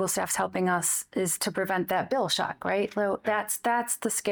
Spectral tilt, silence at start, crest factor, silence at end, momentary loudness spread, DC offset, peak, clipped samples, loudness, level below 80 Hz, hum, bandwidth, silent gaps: -3 dB/octave; 0 s; 14 dB; 0 s; 3 LU; under 0.1%; -14 dBFS; under 0.1%; -27 LUFS; -68 dBFS; none; over 20 kHz; none